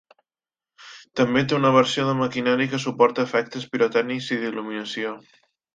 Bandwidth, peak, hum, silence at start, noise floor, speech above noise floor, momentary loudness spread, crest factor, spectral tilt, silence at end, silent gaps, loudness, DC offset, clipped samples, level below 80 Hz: 9.2 kHz; -4 dBFS; none; 0.8 s; under -90 dBFS; over 68 dB; 12 LU; 20 dB; -5.5 dB/octave; 0.55 s; none; -22 LUFS; under 0.1%; under 0.1%; -64 dBFS